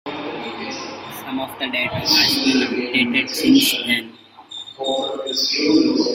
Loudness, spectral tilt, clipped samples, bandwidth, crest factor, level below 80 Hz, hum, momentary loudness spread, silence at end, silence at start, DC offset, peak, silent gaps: -18 LUFS; -3 dB/octave; under 0.1%; 16.5 kHz; 18 dB; -58 dBFS; none; 16 LU; 0 s; 0.05 s; under 0.1%; -2 dBFS; none